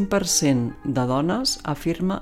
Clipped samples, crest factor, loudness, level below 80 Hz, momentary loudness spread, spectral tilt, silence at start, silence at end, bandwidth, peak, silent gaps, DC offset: under 0.1%; 16 dB; -22 LUFS; -44 dBFS; 7 LU; -4 dB/octave; 0 s; 0 s; 16 kHz; -8 dBFS; none; under 0.1%